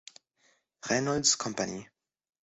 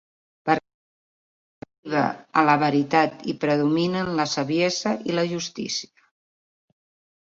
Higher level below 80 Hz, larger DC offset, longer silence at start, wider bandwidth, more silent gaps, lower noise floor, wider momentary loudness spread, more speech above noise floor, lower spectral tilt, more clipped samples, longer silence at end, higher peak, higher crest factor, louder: about the same, -64 dBFS vs -64 dBFS; neither; first, 0.85 s vs 0.45 s; about the same, 8.4 kHz vs 7.8 kHz; second, none vs 0.74-1.62 s, 1.78-1.83 s; second, -70 dBFS vs under -90 dBFS; first, 17 LU vs 9 LU; second, 40 dB vs over 67 dB; second, -2.5 dB/octave vs -5 dB/octave; neither; second, 0.6 s vs 1.35 s; second, -10 dBFS vs -4 dBFS; about the same, 24 dB vs 20 dB; second, -28 LUFS vs -23 LUFS